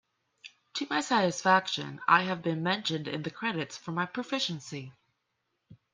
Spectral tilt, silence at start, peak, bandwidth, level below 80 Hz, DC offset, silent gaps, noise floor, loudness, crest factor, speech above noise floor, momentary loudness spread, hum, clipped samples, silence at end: -4 dB/octave; 0.45 s; -8 dBFS; 10 kHz; -76 dBFS; under 0.1%; none; -80 dBFS; -29 LUFS; 24 dB; 50 dB; 13 LU; none; under 0.1%; 0.2 s